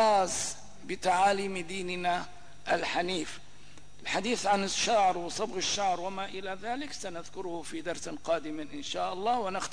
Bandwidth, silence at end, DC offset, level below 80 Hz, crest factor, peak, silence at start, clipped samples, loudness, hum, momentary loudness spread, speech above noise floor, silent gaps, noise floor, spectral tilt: 11 kHz; 0 s; 0.8%; -60 dBFS; 16 dB; -16 dBFS; 0 s; under 0.1%; -31 LUFS; 50 Hz at -60 dBFS; 13 LU; 24 dB; none; -55 dBFS; -2.5 dB/octave